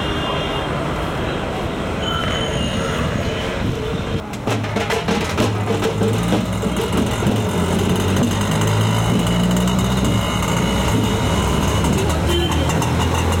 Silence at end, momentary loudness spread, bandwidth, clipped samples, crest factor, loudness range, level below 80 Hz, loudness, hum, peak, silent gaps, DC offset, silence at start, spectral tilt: 0 s; 5 LU; 17 kHz; under 0.1%; 12 dB; 4 LU; -30 dBFS; -19 LUFS; none; -6 dBFS; none; under 0.1%; 0 s; -5.5 dB/octave